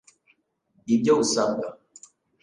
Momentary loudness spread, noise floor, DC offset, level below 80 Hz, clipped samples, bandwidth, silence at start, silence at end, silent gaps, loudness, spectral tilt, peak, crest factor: 16 LU; -67 dBFS; under 0.1%; -66 dBFS; under 0.1%; 11 kHz; 0.85 s; 0.7 s; none; -23 LUFS; -4 dB/octave; -8 dBFS; 18 dB